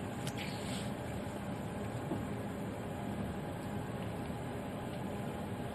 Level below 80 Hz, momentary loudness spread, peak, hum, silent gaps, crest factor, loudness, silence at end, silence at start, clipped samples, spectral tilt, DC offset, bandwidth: -56 dBFS; 2 LU; -22 dBFS; none; none; 18 dB; -41 LUFS; 0 s; 0 s; under 0.1%; -6 dB/octave; under 0.1%; 13.5 kHz